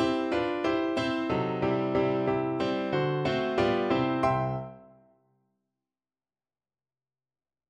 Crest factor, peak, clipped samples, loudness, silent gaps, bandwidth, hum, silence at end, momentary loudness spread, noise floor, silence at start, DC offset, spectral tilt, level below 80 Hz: 16 dB; -14 dBFS; under 0.1%; -28 LUFS; none; 9.4 kHz; none; 2.85 s; 3 LU; under -90 dBFS; 0 s; under 0.1%; -7 dB/octave; -58 dBFS